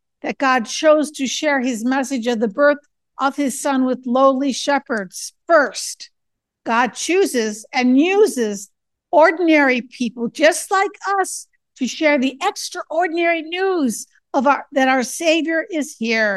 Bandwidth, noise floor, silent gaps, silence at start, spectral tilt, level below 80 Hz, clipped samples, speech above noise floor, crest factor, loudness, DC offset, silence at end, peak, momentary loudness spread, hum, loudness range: 12.5 kHz; -76 dBFS; none; 0.25 s; -3 dB/octave; -72 dBFS; under 0.1%; 59 dB; 18 dB; -18 LUFS; under 0.1%; 0 s; 0 dBFS; 10 LU; none; 3 LU